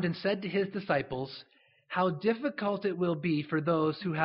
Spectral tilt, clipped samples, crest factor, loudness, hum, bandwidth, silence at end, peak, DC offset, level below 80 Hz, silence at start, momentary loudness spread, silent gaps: -5 dB/octave; under 0.1%; 18 dB; -31 LUFS; none; 5.8 kHz; 0 s; -12 dBFS; under 0.1%; -68 dBFS; 0 s; 8 LU; none